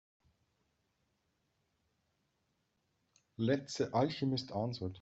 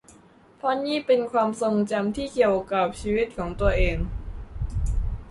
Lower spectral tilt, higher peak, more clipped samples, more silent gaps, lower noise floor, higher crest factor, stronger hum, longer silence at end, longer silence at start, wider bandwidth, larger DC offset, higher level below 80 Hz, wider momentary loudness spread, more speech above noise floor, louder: about the same, -5.5 dB/octave vs -6.5 dB/octave; second, -18 dBFS vs -8 dBFS; neither; neither; first, -81 dBFS vs -53 dBFS; about the same, 22 dB vs 18 dB; neither; about the same, 0 s vs 0 s; first, 3.4 s vs 0.65 s; second, 8 kHz vs 11.5 kHz; neither; second, -74 dBFS vs -32 dBFS; second, 5 LU vs 10 LU; first, 46 dB vs 30 dB; second, -36 LUFS vs -25 LUFS